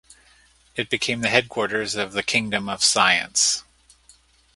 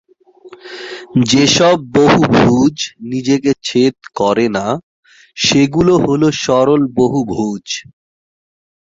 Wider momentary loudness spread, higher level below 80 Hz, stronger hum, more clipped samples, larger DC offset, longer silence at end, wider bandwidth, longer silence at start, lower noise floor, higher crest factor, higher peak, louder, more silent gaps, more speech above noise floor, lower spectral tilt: second, 9 LU vs 14 LU; second, -58 dBFS vs -46 dBFS; neither; neither; neither; about the same, 0.95 s vs 1.05 s; first, 11.5 kHz vs 7.8 kHz; first, 0.75 s vs 0.45 s; first, -56 dBFS vs -41 dBFS; first, 24 dB vs 14 dB; about the same, 0 dBFS vs 0 dBFS; second, -20 LUFS vs -13 LUFS; second, none vs 4.83-5.03 s; first, 34 dB vs 28 dB; second, -1.5 dB/octave vs -5 dB/octave